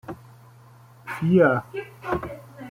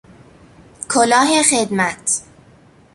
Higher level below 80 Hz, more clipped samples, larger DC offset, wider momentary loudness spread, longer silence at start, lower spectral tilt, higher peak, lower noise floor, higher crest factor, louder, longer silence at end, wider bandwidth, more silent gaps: about the same, -54 dBFS vs -56 dBFS; neither; neither; first, 23 LU vs 8 LU; second, 0.1 s vs 0.8 s; first, -8.5 dB/octave vs -2 dB/octave; second, -6 dBFS vs 0 dBFS; about the same, -50 dBFS vs -48 dBFS; about the same, 20 dB vs 18 dB; second, -23 LUFS vs -15 LUFS; second, 0 s vs 0.7 s; first, 15.5 kHz vs 13.5 kHz; neither